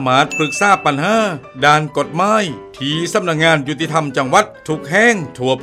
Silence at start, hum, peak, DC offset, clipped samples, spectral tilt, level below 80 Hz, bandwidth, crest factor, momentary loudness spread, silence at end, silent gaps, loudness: 0 s; none; 0 dBFS; under 0.1%; under 0.1%; -4 dB/octave; -52 dBFS; 15.5 kHz; 16 dB; 8 LU; 0 s; none; -15 LUFS